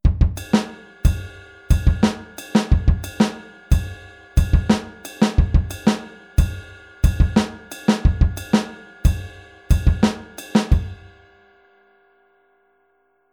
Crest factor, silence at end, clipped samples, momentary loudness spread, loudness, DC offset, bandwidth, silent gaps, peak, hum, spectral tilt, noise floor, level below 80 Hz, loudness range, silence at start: 18 dB; 2.4 s; under 0.1%; 16 LU; -21 LUFS; under 0.1%; 18 kHz; none; -2 dBFS; none; -6.5 dB/octave; -64 dBFS; -22 dBFS; 3 LU; 0.05 s